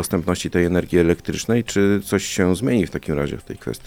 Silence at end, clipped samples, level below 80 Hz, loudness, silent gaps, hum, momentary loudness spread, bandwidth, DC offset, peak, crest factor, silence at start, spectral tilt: 0 s; under 0.1%; -42 dBFS; -20 LUFS; none; none; 6 LU; 17.5 kHz; under 0.1%; -2 dBFS; 18 dB; 0 s; -5.5 dB/octave